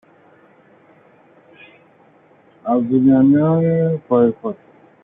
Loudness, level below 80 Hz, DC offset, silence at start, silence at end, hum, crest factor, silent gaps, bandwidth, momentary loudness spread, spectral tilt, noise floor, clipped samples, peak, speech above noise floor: -16 LUFS; -60 dBFS; under 0.1%; 2.65 s; 0.5 s; none; 16 dB; none; 3.7 kHz; 16 LU; -12.5 dB/octave; -51 dBFS; under 0.1%; -4 dBFS; 37 dB